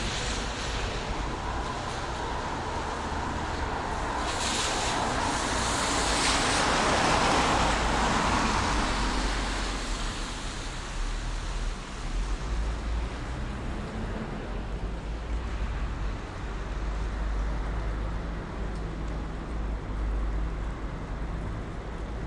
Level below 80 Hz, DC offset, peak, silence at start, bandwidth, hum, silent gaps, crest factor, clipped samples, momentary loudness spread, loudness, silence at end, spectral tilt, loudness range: -34 dBFS; under 0.1%; -12 dBFS; 0 s; 11.5 kHz; none; none; 18 dB; under 0.1%; 12 LU; -30 LUFS; 0 s; -3.5 dB/octave; 10 LU